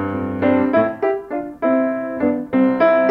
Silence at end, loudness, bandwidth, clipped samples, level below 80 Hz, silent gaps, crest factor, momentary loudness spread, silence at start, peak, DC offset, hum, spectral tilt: 0 s; -18 LUFS; 5.2 kHz; under 0.1%; -54 dBFS; none; 14 dB; 8 LU; 0 s; -2 dBFS; under 0.1%; none; -9 dB/octave